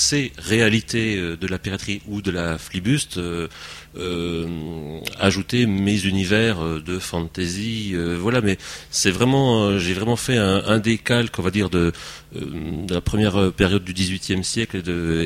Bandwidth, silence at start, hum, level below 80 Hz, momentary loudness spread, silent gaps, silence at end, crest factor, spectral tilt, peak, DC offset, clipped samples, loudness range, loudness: 16 kHz; 0 s; none; -42 dBFS; 11 LU; none; 0 s; 20 dB; -4.5 dB/octave; -2 dBFS; under 0.1%; under 0.1%; 6 LU; -21 LUFS